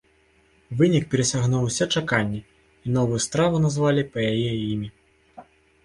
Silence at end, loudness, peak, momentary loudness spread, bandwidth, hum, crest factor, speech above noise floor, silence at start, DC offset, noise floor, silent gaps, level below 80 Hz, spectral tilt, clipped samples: 0.45 s; -23 LUFS; -6 dBFS; 10 LU; 11.5 kHz; none; 18 dB; 38 dB; 0.7 s; under 0.1%; -60 dBFS; none; -52 dBFS; -5 dB/octave; under 0.1%